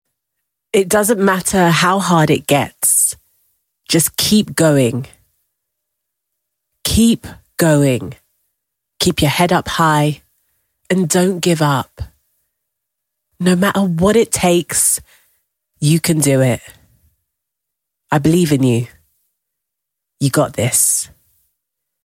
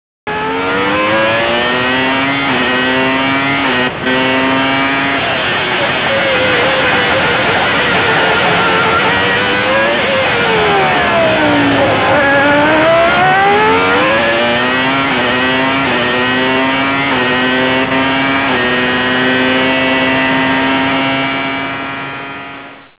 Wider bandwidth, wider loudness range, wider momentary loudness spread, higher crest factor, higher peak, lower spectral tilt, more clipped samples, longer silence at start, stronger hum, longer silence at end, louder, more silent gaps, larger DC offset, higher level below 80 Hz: first, 17 kHz vs 4 kHz; first, 5 LU vs 2 LU; first, 9 LU vs 4 LU; about the same, 16 dB vs 12 dB; about the same, 0 dBFS vs 0 dBFS; second, -4.5 dB/octave vs -8 dB/octave; neither; first, 0.75 s vs 0.25 s; neither; first, 1 s vs 0.2 s; second, -14 LUFS vs -11 LUFS; neither; neither; about the same, -42 dBFS vs -40 dBFS